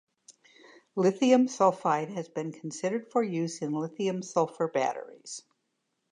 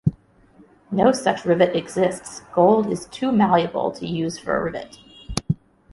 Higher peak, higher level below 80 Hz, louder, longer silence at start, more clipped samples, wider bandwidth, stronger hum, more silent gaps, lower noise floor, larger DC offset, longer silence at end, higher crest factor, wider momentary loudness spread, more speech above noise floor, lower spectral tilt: second, -10 dBFS vs -2 dBFS; second, -84 dBFS vs -48 dBFS; second, -29 LUFS vs -21 LUFS; first, 0.3 s vs 0.05 s; neither; about the same, 10.5 kHz vs 11.5 kHz; neither; neither; first, -79 dBFS vs -53 dBFS; neither; first, 0.7 s vs 0.4 s; about the same, 20 dB vs 20 dB; first, 16 LU vs 12 LU; first, 51 dB vs 32 dB; about the same, -5.5 dB/octave vs -6 dB/octave